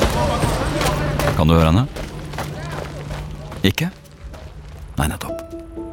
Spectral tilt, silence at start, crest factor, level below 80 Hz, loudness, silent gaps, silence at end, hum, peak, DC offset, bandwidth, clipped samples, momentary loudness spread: -5.5 dB/octave; 0 s; 20 dB; -30 dBFS; -21 LUFS; none; 0 s; none; 0 dBFS; under 0.1%; 18.5 kHz; under 0.1%; 22 LU